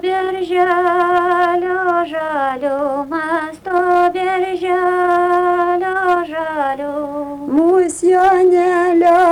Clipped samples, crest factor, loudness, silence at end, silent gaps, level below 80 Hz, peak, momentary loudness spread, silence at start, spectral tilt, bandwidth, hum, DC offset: under 0.1%; 10 dB; -15 LUFS; 0 s; none; -52 dBFS; -4 dBFS; 8 LU; 0.05 s; -4.5 dB/octave; 11.5 kHz; 50 Hz at -55 dBFS; under 0.1%